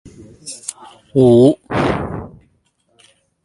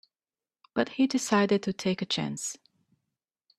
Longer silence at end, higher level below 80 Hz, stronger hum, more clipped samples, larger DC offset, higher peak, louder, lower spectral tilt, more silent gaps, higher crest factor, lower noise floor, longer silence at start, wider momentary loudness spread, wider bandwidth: first, 1.15 s vs 1 s; first, -42 dBFS vs -70 dBFS; neither; neither; neither; first, 0 dBFS vs -10 dBFS; first, -14 LUFS vs -28 LUFS; first, -6.5 dB/octave vs -4.5 dB/octave; neither; about the same, 18 dB vs 20 dB; second, -61 dBFS vs under -90 dBFS; second, 0.05 s vs 0.75 s; first, 22 LU vs 11 LU; second, 11.5 kHz vs 13.5 kHz